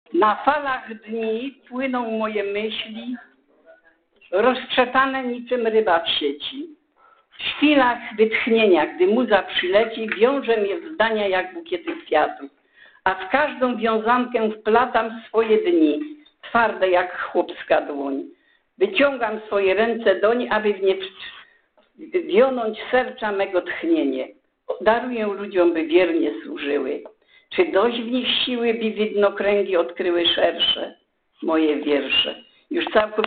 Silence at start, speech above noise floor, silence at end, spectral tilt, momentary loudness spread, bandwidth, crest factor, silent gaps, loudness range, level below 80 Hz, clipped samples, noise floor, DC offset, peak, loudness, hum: 0.1 s; 38 dB; 0 s; -8 dB/octave; 11 LU; 4.6 kHz; 18 dB; none; 4 LU; -60 dBFS; under 0.1%; -59 dBFS; under 0.1%; -4 dBFS; -21 LUFS; none